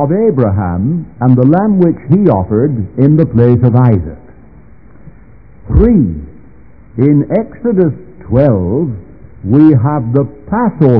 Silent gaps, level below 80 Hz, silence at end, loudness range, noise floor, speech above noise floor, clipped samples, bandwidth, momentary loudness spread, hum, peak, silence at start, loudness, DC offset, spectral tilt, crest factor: none; -28 dBFS; 0 s; 5 LU; -39 dBFS; 30 dB; 1%; 3.6 kHz; 8 LU; none; 0 dBFS; 0 s; -11 LUFS; 1%; -13.5 dB/octave; 10 dB